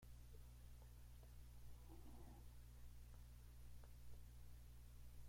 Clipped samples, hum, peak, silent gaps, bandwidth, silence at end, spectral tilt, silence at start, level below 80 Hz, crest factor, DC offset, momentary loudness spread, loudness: under 0.1%; 60 Hz at -60 dBFS; -46 dBFS; none; 16.5 kHz; 0 s; -5.5 dB/octave; 0 s; -62 dBFS; 12 dB; under 0.1%; 1 LU; -64 LUFS